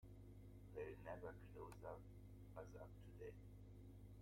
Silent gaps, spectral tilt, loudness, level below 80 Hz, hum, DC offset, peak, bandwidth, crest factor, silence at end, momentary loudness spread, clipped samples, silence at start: none; -7.5 dB/octave; -59 LUFS; -66 dBFS; 50 Hz at -60 dBFS; under 0.1%; -40 dBFS; 16.5 kHz; 18 dB; 0 s; 8 LU; under 0.1%; 0 s